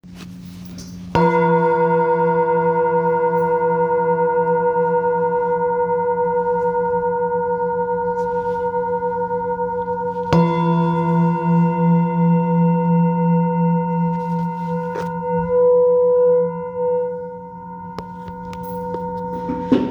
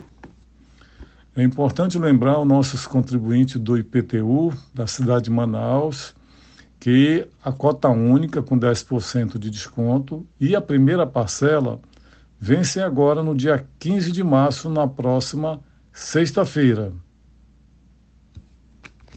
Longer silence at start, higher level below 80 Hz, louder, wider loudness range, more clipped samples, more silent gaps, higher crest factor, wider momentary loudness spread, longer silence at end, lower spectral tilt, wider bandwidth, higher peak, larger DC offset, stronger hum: second, 0.05 s vs 0.25 s; about the same, -50 dBFS vs -52 dBFS; about the same, -18 LUFS vs -20 LUFS; about the same, 4 LU vs 3 LU; neither; neither; about the same, 18 dB vs 18 dB; first, 14 LU vs 11 LU; second, 0 s vs 0.75 s; first, -9.5 dB/octave vs -6.5 dB/octave; second, 6.6 kHz vs 8.8 kHz; first, 0 dBFS vs -4 dBFS; neither; neither